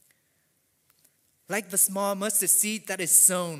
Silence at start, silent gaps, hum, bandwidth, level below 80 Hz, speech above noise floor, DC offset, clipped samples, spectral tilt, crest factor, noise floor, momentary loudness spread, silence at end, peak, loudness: 1.5 s; none; none; 16 kHz; -78 dBFS; 46 dB; under 0.1%; under 0.1%; -1.5 dB/octave; 22 dB; -70 dBFS; 12 LU; 0 s; -4 dBFS; -22 LUFS